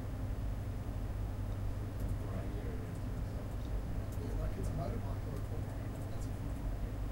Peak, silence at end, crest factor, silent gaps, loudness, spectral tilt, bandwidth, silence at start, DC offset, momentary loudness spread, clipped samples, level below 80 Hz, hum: -26 dBFS; 0 s; 12 dB; none; -41 LUFS; -7.5 dB/octave; 16 kHz; 0 s; under 0.1%; 3 LU; under 0.1%; -42 dBFS; none